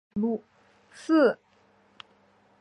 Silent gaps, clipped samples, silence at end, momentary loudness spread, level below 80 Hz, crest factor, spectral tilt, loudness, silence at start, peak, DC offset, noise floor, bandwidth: none; under 0.1%; 1.25 s; 18 LU; -68 dBFS; 18 dB; -6.5 dB/octave; -25 LUFS; 0.15 s; -10 dBFS; under 0.1%; -63 dBFS; 10.5 kHz